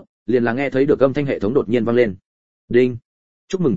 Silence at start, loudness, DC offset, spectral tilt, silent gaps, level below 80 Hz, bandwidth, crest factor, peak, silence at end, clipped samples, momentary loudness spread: 0 s; -19 LUFS; 1%; -8 dB/octave; 0.09-0.26 s, 2.26-2.68 s, 3.05-3.48 s; -50 dBFS; 7.6 kHz; 18 dB; -2 dBFS; 0 s; under 0.1%; 6 LU